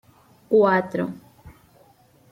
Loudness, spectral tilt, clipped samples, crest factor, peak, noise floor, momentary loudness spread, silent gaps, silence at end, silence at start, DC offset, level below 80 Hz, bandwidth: -21 LUFS; -8 dB/octave; under 0.1%; 18 dB; -8 dBFS; -56 dBFS; 15 LU; none; 0.8 s; 0.5 s; under 0.1%; -62 dBFS; 11.5 kHz